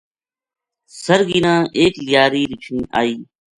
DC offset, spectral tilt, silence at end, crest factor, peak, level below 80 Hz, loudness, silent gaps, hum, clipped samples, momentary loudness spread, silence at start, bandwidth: under 0.1%; -5 dB/octave; 0.35 s; 18 dB; 0 dBFS; -50 dBFS; -16 LUFS; none; none; under 0.1%; 10 LU; 0.95 s; 11.5 kHz